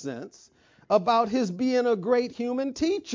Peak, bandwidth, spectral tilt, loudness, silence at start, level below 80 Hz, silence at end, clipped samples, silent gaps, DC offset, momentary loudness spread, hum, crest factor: -8 dBFS; 7.6 kHz; -5.5 dB/octave; -25 LUFS; 0 s; -62 dBFS; 0 s; under 0.1%; none; under 0.1%; 11 LU; none; 18 dB